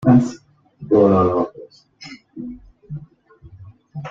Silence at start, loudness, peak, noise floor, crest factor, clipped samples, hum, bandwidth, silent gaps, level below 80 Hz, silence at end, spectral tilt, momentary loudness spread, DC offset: 0 s; -17 LUFS; -2 dBFS; -47 dBFS; 18 dB; under 0.1%; none; 7.6 kHz; none; -52 dBFS; 0 s; -9 dB/octave; 25 LU; under 0.1%